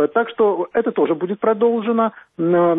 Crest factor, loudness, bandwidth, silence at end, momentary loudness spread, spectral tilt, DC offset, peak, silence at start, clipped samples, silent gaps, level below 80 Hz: 12 dB; -19 LUFS; 3.9 kHz; 0 s; 3 LU; -11 dB/octave; under 0.1%; -6 dBFS; 0 s; under 0.1%; none; -64 dBFS